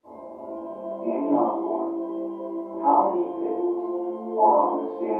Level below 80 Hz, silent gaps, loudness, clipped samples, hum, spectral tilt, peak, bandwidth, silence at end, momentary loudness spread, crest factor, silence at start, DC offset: -76 dBFS; none; -25 LUFS; under 0.1%; none; -10 dB/octave; -8 dBFS; 3.4 kHz; 0 s; 15 LU; 18 dB; 0.05 s; under 0.1%